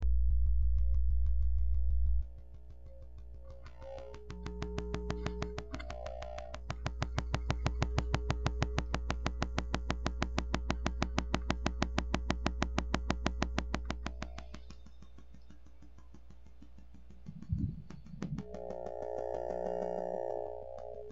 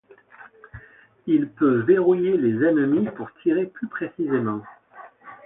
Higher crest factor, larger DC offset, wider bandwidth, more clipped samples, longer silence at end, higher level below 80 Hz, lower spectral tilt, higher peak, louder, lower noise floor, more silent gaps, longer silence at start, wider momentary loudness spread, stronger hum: first, 22 dB vs 16 dB; first, 0.3% vs under 0.1%; first, 7.8 kHz vs 3.8 kHz; neither; about the same, 0 s vs 0.1 s; first, -38 dBFS vs -62 dBFS; second, -6 dB/octave vs -12 dB/octave; second, -12 dBFS vs -6 dBFS; second, -37 LUFS vs -22 LUFS; first, -57 dBFS vs -50 dBFS; neither; second, 0 s vs 0.4 s; first, 18 LU vs 12 LU; neither